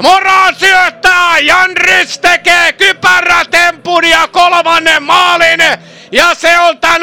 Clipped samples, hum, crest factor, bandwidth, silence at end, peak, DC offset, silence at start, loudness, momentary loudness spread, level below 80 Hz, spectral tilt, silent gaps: 0.7%; none; 8 dB; 17.5 kHz; 0 s; 0 dBFS; 1%; 0 s; -6 LUFS; 3 LU; -40 dBFS; -1 dB/octave; none